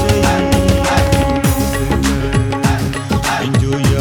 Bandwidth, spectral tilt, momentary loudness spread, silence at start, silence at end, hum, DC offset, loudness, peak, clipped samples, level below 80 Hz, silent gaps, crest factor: 19 kHz; -5.5 dB/octave; 3 LU; 0 s; 0 s; none; under 0.1%; -15 LUFS; -2 dBFS; under 0.1%; -22 dBFS; none; 12 dB